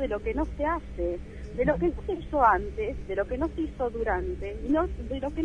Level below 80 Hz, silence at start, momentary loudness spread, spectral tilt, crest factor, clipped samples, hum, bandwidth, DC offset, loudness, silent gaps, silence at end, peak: -38 dBFS; 0 s; 10 LU; -8 dB/octave; 20 dB; under 0.1%; none; 9.8 kHz; under 0.1%; -29 LUFS; none; 0 s; -8 dBFS